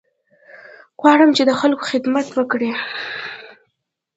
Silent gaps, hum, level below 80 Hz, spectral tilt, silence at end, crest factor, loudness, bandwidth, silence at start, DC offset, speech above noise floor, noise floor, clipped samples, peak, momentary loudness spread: none; none; -66 dBFS; -4 dB/octave; 0.7 s; 18 dB; -17 LUFS; 8 kHz; 0.55 s; under 0.1%; 58 dB; -74 dBFS; under 0.1%; 0 dBFS; 15 LU